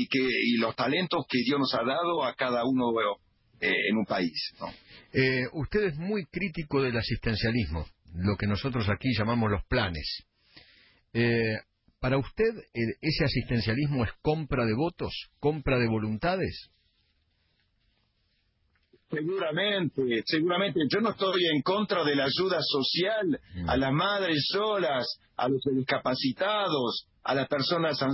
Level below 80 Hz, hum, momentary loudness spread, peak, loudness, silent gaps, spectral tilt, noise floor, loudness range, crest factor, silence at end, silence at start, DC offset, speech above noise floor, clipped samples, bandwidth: -48 dBFS; none; 7 LU; -14 dBFS; -28 LUFS; none; -9.5 dB/octave; -72 dBFS; 5 LU; 16 dB; 0 s; 0 s; under 0.1%; 44 dB; under 0.1%; 5.8 kHz